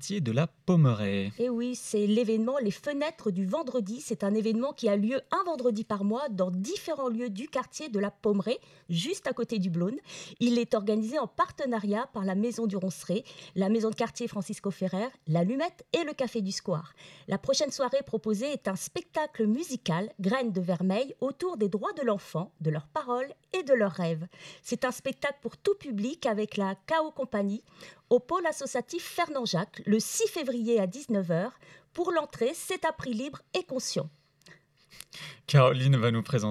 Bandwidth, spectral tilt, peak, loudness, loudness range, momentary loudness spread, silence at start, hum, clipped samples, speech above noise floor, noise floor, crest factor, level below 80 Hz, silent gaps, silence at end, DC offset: 14.5 kHz; -5.5 dB/octave; -8 dBFS; -30 LUFS; 2 LU; 8 LU; 0 s; none; under 0.1%; 29 dB; -58 dBFS; 22 dB; -70 dBFS; none; 0 s; under 0.1%